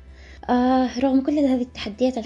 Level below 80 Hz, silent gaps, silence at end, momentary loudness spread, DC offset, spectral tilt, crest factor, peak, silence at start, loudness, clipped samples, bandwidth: -46 dBFS; none; 0 s; 7 LU; under 0.1%; -6 dB/octave; 12 dB; -8 dBFS; 0 s; -21 LUFS; under 0.1%; 7.6 kHz